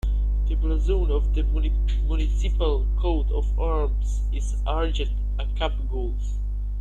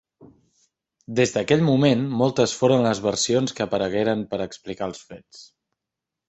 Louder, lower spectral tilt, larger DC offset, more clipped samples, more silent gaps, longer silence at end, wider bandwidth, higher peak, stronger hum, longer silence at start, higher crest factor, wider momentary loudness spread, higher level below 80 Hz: second, -26 LUFS vs -22 LUFS; first, -7 dB/octave vs -5 dB/octave; neither; neither; neither; second, 0 s vs 0.85 s; about the same, 7.6 kHz vs 8.2 kHz; second, -10 dBFS vs -4 dBFS; first, 50 Hz at -20 dBFS vs none; second, 0.05 s vs 1.1 s; second, 12 dB vs 20 dB; second, 5 LU vs 13 LU; first, -22 dBFS vs -58 dBFS